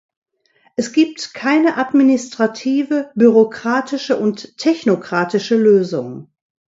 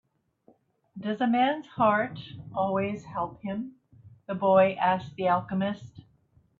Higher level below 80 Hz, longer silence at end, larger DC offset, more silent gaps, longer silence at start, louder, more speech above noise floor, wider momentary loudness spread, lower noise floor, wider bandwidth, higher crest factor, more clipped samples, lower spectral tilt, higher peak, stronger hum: about the same, -66 dBFS vs -66 dBFS; about the same, 0.55 s vs 0.6 s; neither; neither; second, 0.8 s vs 0.95 s; first, -16 LUFS vs -27 LUFS; first, 43 dB vs 37 dB; second, 10 LU vs 15 LU; second, -58 dBFS vs -64 dBFS; about the same, 7.8 kHz vs 7.2 kHz; about the same, 16 dB vs 20 dB; neither; second, -5.5 dB/octave vs -8 dB/octave; first, 0 dBFS vs -10 dBFS; neither